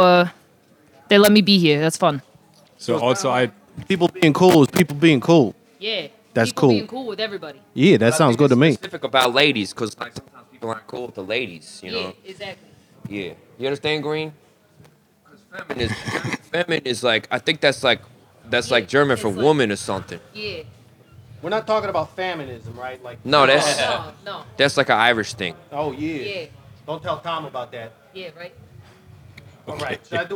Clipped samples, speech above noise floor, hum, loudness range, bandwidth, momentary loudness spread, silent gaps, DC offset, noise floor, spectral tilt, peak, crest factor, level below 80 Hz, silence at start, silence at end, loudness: under 0.1%; 35 dB; none; 12 LU; over 20 kHz; 19 LU; none; under 0.1%; -55 dBFS; -5 dB/octave; 0 dBFS; 20 dB; -60 dBFS; 0 s; 0 s; -19 LUFS